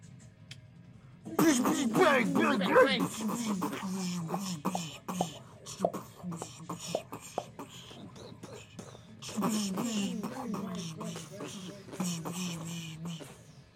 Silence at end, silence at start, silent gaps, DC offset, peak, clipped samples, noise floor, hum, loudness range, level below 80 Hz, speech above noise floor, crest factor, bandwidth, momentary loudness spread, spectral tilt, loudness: 0.15 s; 0 s; none; under 0.1%; -10 dBFS; under 0.1%; -53 dBFS; none; 12 LU; -70 dBFS; 24 dB; 22 dB; 16.5 kHz; 22 LU; -4.5 dB/octave; -32 LUFS